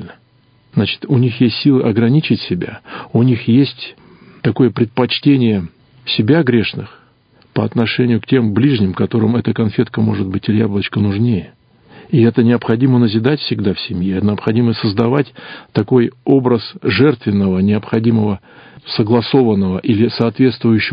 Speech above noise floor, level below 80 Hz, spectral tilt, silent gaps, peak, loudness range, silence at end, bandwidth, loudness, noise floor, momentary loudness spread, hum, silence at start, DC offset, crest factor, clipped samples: 39 dB; -42 dBFS; -10.5 dB/octave; none; 0 dBFS; 1 LU; 0 s; 5.2 kHz; -15 LUFS; -52 dBFS; 9 LU; none; 0 s; under 0.1%; 14 dB; under 0.1%